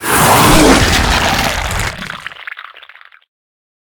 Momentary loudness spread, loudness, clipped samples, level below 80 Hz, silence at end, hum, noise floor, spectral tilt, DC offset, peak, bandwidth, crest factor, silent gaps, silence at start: 20 LU; -10 LUFS; 0.2%; -24 dBFS; 1.1 s; none; -40 dBFS; -3.5 dB/octave; under 0.1%; 0 dBFS; over 20 kHz; 14 dB; none; 0 s